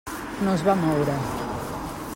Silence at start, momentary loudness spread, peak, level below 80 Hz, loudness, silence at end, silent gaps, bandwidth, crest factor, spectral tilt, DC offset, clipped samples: 0.05 s; 11 LU; -6 dBFS; -46 dBFS; -25 LUFS; 0 s; none; 16.5 kHz; 18 dB; -6.5 dB/octave; under 0.1%; under 0.1%